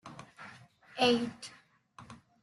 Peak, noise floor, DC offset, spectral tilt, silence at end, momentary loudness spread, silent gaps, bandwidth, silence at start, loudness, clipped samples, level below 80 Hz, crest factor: -16 dBFS; -57 dBFS; under 0.1%; -4 dB/octave; 0.3 s; 25 LU; none; 12 kHz; 0.05 s; -30 LUFS; under 0.1%; -74 dBFS; 20 dB